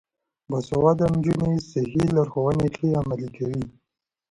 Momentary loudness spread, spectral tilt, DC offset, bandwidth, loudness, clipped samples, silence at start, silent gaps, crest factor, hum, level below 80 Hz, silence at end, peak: 10 LU; -8.5 dB/octave; under 0.1%; 11 kHz; -24 LUFS; under 0.1%; 0.5 s; none; 18 dB; none; -48 dBFS; 0.6 s; -6 dBFS